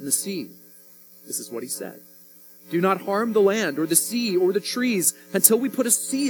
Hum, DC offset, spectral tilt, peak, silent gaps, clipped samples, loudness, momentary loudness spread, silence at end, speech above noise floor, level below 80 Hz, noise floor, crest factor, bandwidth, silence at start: none; under 0.1%; -3 dB/octave; 0 dBFS; none; under 0.1%; -22 LUFS; 14 LU; 0 s; 26 dB; -82 dBFS; -49 dBFS; 24 dB; 18 kHz; 0 s